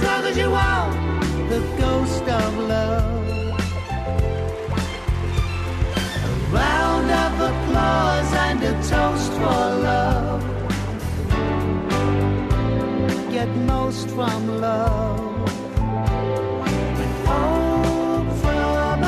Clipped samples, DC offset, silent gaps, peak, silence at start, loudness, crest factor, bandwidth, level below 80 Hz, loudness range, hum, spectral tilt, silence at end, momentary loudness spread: under 0.1%; under 0.1%; none; -8 dBFS; 0 s; -21 LUFS; 12 dB; 13.5 kHz; -28 dBFS; 3 LU; none; -6 dB/octave; 0 s; 6 LU